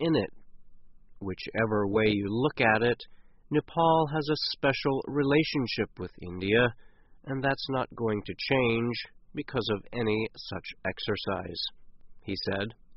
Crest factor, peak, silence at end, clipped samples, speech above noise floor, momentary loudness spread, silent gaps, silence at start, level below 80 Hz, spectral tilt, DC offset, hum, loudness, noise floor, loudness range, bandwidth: 20 dB; -10 dBFS; 0 s; under 0.1%; 19 dB; 13 LU; none; 0 s; -56 dBFS; -4 dB/octave; under 0.1%; none; -29 LUFS; -48 dBFS; 6 LU; 6 kHz